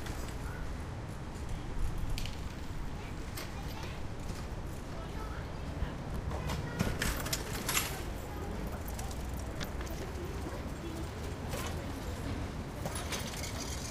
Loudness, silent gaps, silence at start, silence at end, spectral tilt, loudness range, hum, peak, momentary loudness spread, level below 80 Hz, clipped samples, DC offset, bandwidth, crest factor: -39 LUFS; none; 0 s; 0 s; -4.5 dB/octave; 5 LU; none; -14 dBFS; 8 LU; -42 dBFS; under 0.1%; under 0.1%; 16 kHz; 24 dB